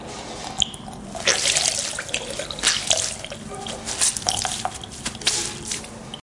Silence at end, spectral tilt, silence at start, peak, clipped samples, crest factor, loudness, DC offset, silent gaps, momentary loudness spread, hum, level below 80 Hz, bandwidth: 0.05 s; -0.5 dB/octave; 0 s; 0 dBFS; under 0.1%; 26 dB; -22 LUFS; under 0.1%; none; 14 LU; none; -48 dBFS; 11.5 kHz